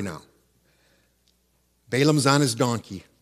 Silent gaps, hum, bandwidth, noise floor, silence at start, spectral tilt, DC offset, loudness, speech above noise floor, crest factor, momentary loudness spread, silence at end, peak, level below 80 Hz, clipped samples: none; none; 15 kHz; -67 dBFS; 0 s; -5 dB/octave; under 0.1%; -22 LUFS; 44 dB; 22 dB; 19 LU; 0.25 s; -4 dBFS; -64 dBFS; under 0.1%